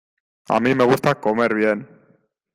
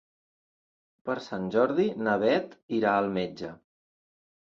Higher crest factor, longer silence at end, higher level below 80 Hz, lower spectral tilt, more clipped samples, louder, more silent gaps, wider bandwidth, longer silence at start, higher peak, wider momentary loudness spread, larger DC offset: about the same, 18 dB vs 20 dB; second, 0.7 s vs 0.95 s; first, -58 dBFS vs -68 dBFS; about the same, -6.5 dB/octave vs -7 dB/octave; neither; first, -19 LUFS vs -28 LUFS; second, none vs 2.63-2.69 s; first, 16 kHz vs 7.4 kHz; second, 0.5 s vs 1.05 s; first, -4 dBFS vs -10 dBFS; second, 6 LU vs 12 LU; neither